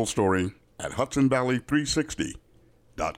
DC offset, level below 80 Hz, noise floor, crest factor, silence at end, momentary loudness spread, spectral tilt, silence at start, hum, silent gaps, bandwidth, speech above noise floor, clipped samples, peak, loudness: under 0.1%; -48 dBFS; -58 dBFS; 14 dB; 0.05 s; 13 LU; -5 dB/octave; 0 s; none; none; 15.5 kHz; 32 dB; under 0.1%; -12 dBFS; -26 LUFS